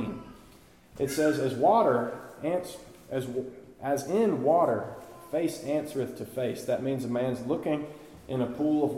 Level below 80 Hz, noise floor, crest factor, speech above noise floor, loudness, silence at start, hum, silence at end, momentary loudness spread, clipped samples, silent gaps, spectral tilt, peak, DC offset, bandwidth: -62 dBFS; -55 dBFS; 18 dB; 27 dB; -29 LUFS; 0 s; none; 0 s; 17 LU; under 0.1%; none; -6 dB/octave; -12 dBFS; under 0.1%; 16.5 kHz